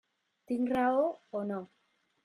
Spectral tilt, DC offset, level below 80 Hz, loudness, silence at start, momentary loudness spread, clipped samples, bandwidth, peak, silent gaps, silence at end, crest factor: -7.5 dB/octave; under 0.1%; -74 dBFS; -32 LUFS; 0.5 s; 10 LU; under 0.1%; 11.5 kHz; -18 dBFS; none; 0.6 s; 16 dB